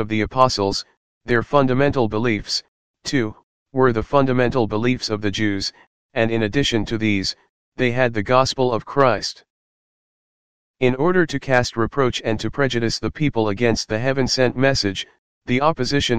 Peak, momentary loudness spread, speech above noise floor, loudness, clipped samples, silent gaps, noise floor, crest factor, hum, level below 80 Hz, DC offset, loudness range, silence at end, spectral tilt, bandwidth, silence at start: 0 dBFS; 7 LU; over 71 dB; -20 LUFS; under 0.1%; 0.97-1.21 s, 2.68-2.94 s, 3.43-3.66 s, 5.87-6.09 s, 7.49-7.72 s, 9.50-10.74 s, 15.18-15.41 s; under -90 dBFS; 20 dB; none; -44 dBFS; 2%; 2 LU; 0 s; -5 dB/octave; 9.8 kHz; 0 s